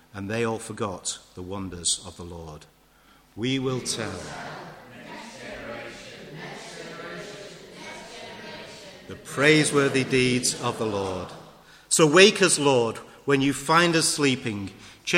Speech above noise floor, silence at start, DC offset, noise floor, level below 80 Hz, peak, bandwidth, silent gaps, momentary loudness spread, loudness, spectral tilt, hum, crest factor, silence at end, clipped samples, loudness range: 33 dB; 0.15 s; under 0.1%; -57 dBFS; -58 dBFS; -2 dBFS; 16.5 kHz; none; 22 LU; -23 LUFS; -3.5 dB/octave; none; 24 dB; 0 s; under 0.1%; 18 LU